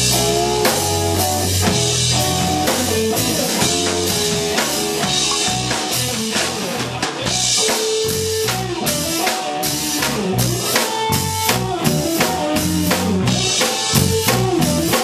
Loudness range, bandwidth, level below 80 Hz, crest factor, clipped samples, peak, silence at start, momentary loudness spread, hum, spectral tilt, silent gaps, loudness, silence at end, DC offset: 2 LU; 15.5 kHz; -40 dBFS; 18 dB; under 0.1%; 0 dBFS; 0 s; 4 LU; none; -3 dB/octave; none; -17 LUFS; 0 s; under 0.1%